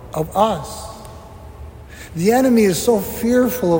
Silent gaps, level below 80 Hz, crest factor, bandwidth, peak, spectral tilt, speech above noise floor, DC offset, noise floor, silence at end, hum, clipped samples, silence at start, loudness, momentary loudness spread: none; -42 dBFS; 16 dB; 16.5 kHz; -2 dBFS; -5.5 dB/octave; 21 dB; under 0.1%; -37 dBFS; 0 s; none; under 0.1%; 0 s; -17 LUFS; 23 LU